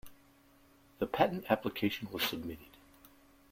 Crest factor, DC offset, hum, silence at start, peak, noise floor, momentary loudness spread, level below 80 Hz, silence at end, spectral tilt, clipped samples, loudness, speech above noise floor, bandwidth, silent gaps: 26 dB; under 0.1%; none; 0.05 s; -12 dBFS; -64 dBFS; 12 LU; -66 dBFS; 0.45 s; -5 dB/octave; under 0.1%; -34 LUFS; 30 dB; 16.5 kHz; none